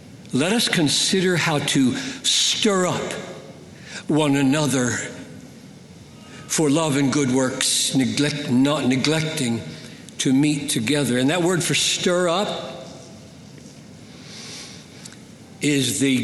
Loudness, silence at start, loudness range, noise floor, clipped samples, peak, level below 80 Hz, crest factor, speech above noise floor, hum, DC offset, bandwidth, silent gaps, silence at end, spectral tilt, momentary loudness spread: -20 LUFS; 0.05 s; 6 LU; -43 dBFS; under 0.1%; -2 dBFS; -60 dBFS; 20 dB; 23 dB; none; under 0.1%; 12.5 kHz; none; 0 s; -3.5 dB/octave; 21 LU